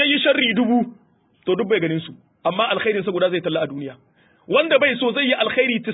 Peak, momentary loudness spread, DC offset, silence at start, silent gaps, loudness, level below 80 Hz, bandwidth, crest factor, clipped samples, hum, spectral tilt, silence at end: -4 dBFS; 12 LU; under 0.1%; 0 s; none; -19 LUFS; -66 dBFS; 4 kHz; 16 dB; under 0.1%; none; -10 dB/octave; 0 s